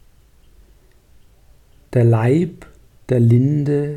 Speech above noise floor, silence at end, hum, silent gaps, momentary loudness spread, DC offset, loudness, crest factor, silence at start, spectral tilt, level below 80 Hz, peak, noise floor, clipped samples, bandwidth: 35 dB; 0 s; none; none; 8 LU; under 0.1%; -17 LUFS; 14 dB; 1.9 s; -10 dB/octave; -50 dBFS; -4 dBFS; -50 dBFS; under 0.1%; 8.6 kHz